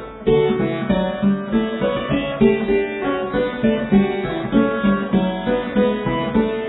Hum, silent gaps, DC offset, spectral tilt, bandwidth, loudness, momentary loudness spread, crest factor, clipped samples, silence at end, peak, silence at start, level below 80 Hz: none; none; under 0.1%; -11 dB/octave; 4.1 kHz; -19 LUFS; 5 LU; 16 dB; under 0.1%; 0 s; -2 dBFS; 0 s; -40 dBFS